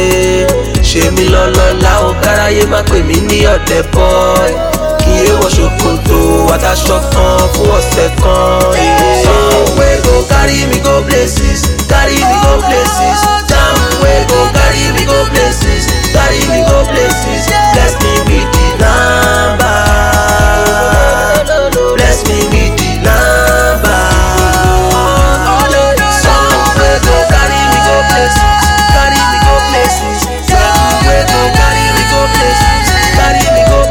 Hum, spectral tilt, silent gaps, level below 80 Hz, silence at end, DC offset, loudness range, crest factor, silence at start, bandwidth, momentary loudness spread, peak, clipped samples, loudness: none; -4 dB/octave; none; -14 dBFS; 0 s; under 0.1%; 1 LU; 8 dB; 0 s; 18 kHz; 3 LU; 0 dBFS; 0.2%; -8 LUFS